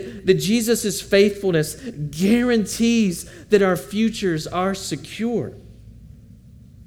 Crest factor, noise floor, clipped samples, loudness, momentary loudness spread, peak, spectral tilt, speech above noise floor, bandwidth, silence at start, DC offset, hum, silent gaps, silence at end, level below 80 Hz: 18 dB; -45 dBFS; under 0.1%; -20 LUFS; 10 LU; -2 dBFS; -5 dB/octave; 25 dB; 17.5 kHz; 0 s; under 0.1%; none; none; 0.05 s; -48 dBFS